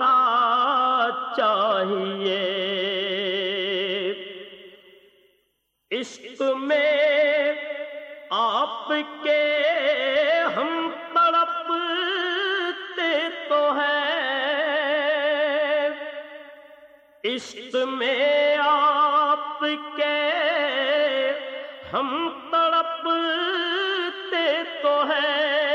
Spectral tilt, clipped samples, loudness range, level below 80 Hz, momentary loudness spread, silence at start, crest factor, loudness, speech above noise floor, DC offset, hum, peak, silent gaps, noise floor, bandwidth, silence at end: -3.5 dB/octave; under 0.1%; 5 LU; -74 dBFS; 11 LU; 0 s; 14 dB; -22 LUFS; 50 dB; under 0.1%; none; -10 dBFS; none; -72 dBFS; 8.2 kHz; 0 s